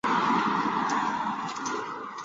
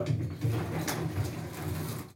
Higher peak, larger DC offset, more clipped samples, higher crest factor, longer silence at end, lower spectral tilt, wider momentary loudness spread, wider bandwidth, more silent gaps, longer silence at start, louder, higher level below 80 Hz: first, -12 dBFS vs -18 dBFS; neither; neither; about the same, 16 dB vs 16 dB; about the same, 0 s vs 0 s; second, -4 dB/octave vs -6 dB/octave; first, 8 LU vs 5 LU; second, 9.8 kHz vs 16.5 kHz; neither; about the same, 0.05 s vs 0 s; first, -28 LUFS vs -34 LUFS; second, -66 dBFS vs -54 dBFS